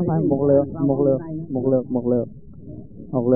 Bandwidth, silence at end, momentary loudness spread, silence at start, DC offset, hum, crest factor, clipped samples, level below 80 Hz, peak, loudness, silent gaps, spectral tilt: 1.9 kHz; 0 s; 21 LU; 0 s; 0.6%; none; 16 dB; under 0.1%; -50 dBFS; -4 dBFS; -21 LUFS; none; -10.5 dB/octave